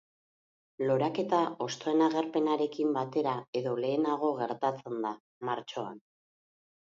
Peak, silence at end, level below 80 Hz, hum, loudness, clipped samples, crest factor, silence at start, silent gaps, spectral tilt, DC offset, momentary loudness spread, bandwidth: -14 dBFS; 0.85 s; -82 dBFS; none; -31 LUFS; under 0.1%; 18 dB; 0.8 s; 3.48-3.53 s, 5.20-5.41 s; -6 dB/octave; under 0.1%; 8 LU; 7.6 kHz